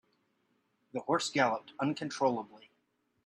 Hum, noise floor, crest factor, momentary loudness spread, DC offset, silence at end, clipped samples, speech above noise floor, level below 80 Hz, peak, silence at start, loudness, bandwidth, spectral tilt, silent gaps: none; -77 dBFS; 22 dB; 12 LU; under 0.1%; 0.7 s; under 0.1%; 45 dB; -80 dBFS; -14 dBFS; 0.95 s; -33 LUFS; 12.5 kHz; -4.5 dB/octave; none